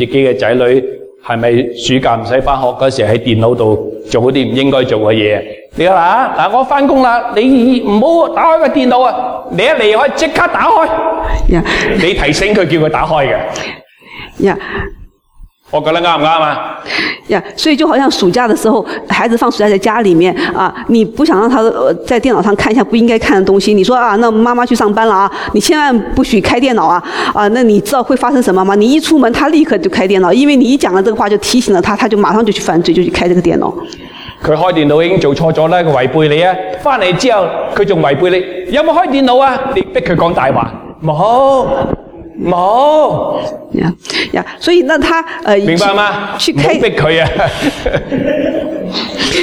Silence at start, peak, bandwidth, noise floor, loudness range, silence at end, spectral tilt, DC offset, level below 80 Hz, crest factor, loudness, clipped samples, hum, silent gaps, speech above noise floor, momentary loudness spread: 0 s; 0 dBFS; 17 kHz; -38 dBFS; 3 LU; 0 s; -5.5 dB/octave; under 0.1%; -30 dBFS; 10 dB; -10 LUFS; under 0.1%; none; none; 28 dB; 7 LU